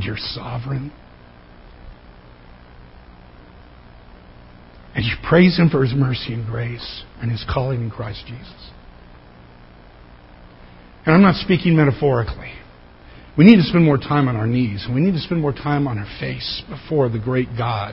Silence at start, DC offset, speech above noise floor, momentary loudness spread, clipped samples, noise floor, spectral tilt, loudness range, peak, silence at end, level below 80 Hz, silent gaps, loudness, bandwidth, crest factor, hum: 0 s; under 0.1%; 26 dB; 17 LU; under 0.1%; -44 dBFS; -10 dB/octave; 15 LU; 0 dBFS; 0 s; -40 dBFS; none; -18 LUFS; 5.8 kHz; 20 dB; 60 Hz at -45 dBFS